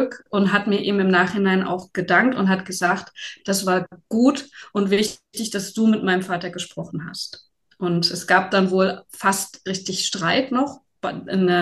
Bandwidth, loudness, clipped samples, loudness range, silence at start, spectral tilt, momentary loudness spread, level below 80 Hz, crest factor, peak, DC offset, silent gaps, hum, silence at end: 12.5 kHz; -21 LUFS; under 0.1%; 4 LU; 0 s; -4.5 dB/octave; 12 LU; -64 dBFS; 18 dB; -2 dBFS; under 0.1%; none; none; 0 s